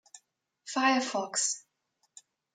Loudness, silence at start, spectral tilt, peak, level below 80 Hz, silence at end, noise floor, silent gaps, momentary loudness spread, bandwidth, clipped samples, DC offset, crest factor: -29 LUFS; 0.15 s; -1 dB/octave; -14 dBFS; under -90 dBFS; 0.95 s; -77 dBFS; none; 12 LU; 9.6 kHz; under 0.1%; under 0.1%; 20 dB